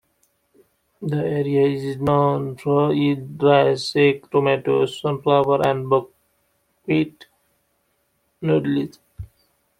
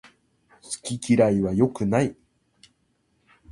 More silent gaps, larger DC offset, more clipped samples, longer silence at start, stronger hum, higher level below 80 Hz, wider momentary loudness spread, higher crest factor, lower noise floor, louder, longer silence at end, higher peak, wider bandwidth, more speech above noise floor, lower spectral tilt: neither; neither; neither; first, 1 s vs 0.7 s; neither; about the same, -56 dBFS vs -54 dBFS; about the same, 12 LU vs 13 LU; about the same, 18 dB vs 20 dB; about the same, -68 dBFS vs -69 dBFS; first, -20 LUFS vs -23 LUFS; second, 0.55 s vs 1.4 s; first, -2 dBFS vs -6 dBFS; about the same, 12 kHz vs 11.5 kHz; about the same, 49 dB vs 47 dB; about the same, -7 dB/octave vs -6.5 dB/octave